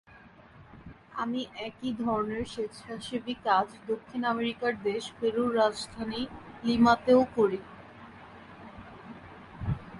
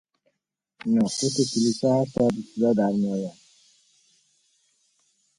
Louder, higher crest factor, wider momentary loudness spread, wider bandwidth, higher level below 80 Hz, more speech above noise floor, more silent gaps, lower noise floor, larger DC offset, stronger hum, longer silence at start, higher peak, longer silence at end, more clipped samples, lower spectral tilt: second, -29 LUFS vs -24 LUFS; first, 22 dB vs 16 dB; first, 25 LU vs 7 LU; about the same, 11.5 kHz vs 11.5 kHz; first, -56 dBFS vs -62 dBFS; second, 25 dB vs 57 dB; neither; second, -54 dBFS vs -80 dBFS; neither; neither; second, 0.15 s vs 0.85 s; about the same, -10 dBFS vs -10 dBFS; second, 0 s vs 2.05 s; neither; about the same, -6 dB/octave vs -5.5 dB/octave